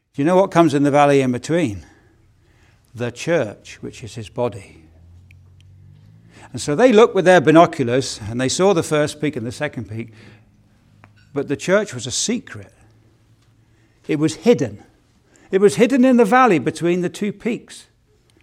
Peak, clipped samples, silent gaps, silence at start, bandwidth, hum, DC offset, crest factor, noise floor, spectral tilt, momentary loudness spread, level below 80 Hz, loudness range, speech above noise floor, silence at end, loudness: 0 dBFS; under 0.1%; none; 0.2 s; 15 kHz; none; under 0.1%; 18 dB; -57 dBFS; -5 dB/octave; 19 LU; -56 dBFS; 11 LU; 40 dB; 0.6 s; -17 LUFS